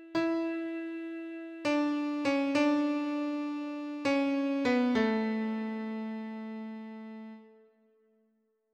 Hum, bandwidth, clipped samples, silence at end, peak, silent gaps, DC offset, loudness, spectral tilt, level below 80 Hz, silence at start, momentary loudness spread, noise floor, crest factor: none; 9 kHz; under 0.1%; 1.25 s; -16 dBFS; none; under 0.1%; -32 LUFS; -5.5 dB/octave; -74 dBFS; 0 s; 14 LU; -74 dBFS; 16 dB